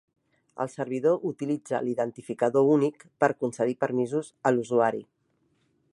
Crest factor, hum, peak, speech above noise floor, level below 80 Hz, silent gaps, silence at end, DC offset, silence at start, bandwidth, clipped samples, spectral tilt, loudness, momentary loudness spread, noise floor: 20 dB; none; -6 dBFS; 45 dB; -76 dBFS; none; 0.9 s; under 0.1%; 0.55 s; 11.5 kHz; under 0.1%; -7 dB/octave; -27 LUFS; 9 LU; -71 dBFS